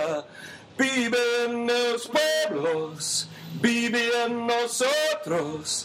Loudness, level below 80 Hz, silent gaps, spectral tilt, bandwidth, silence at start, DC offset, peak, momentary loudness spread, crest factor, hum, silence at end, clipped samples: -25 LUFS; -70 dBFS; none; -2.5 dB/octave; 16 kHz; 0 s; under 0.1%; -8 dBFS; 6 LU; 16 dB; none; 0 s; under 0.1%